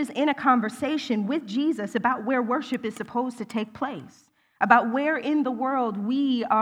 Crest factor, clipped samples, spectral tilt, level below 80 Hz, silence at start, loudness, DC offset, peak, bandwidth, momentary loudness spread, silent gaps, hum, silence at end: 22 dB; under 0.1%; -5.5 dB/octave; -70 dBFS; 0 s; -25 LUFS; under 0.1%; -2 dBFS; 12.5 kHz; 11 LU; none; none; 0 s